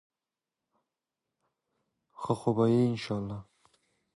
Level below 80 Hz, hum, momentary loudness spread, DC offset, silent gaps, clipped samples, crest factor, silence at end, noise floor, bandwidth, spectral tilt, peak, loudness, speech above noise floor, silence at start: -66 dBFS; none; 16 LU; under 0.1%; none; under 0.1%; 20 dB; 0.75 s; under -90 dBFS; 11.5 kHz; -8 dB/octave; -14 dBFS; -29 LUFS; over 62 dB; 2.2 s